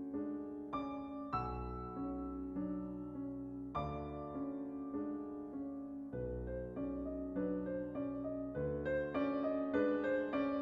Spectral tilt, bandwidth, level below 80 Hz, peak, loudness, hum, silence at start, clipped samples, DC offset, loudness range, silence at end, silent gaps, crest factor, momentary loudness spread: -9.5 dB/octave; 5.2 kHz; -56 dBFS; -24 dBFS; -41 LUFS; none; 0 s; under 0.1%; under 0.1%; 6 LU; 0 s; none; 16 dB; 8 LU